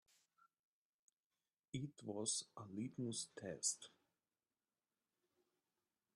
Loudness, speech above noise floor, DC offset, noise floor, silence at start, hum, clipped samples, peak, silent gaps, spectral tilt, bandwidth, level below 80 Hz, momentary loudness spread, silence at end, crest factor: -46 LUFS; over 43 dB; under 0.1%; under -90 dBFS; 1.75 s; none; under 0.1%; -26 dBFS; none; -3.5 dB/octave; 12 kHz; -86 dBFS; 10 LU; 2.3 s; 26 dB